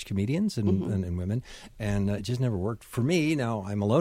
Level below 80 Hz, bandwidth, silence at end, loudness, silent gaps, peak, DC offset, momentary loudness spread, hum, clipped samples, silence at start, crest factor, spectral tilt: -50 dBFS; 15.5 kHz; 0 s; -29 LUFS; none; -12 dBFS; under 0.1%; 7 LU; none; under 0.1%; 0 s; 16 dB; -7 dB/octave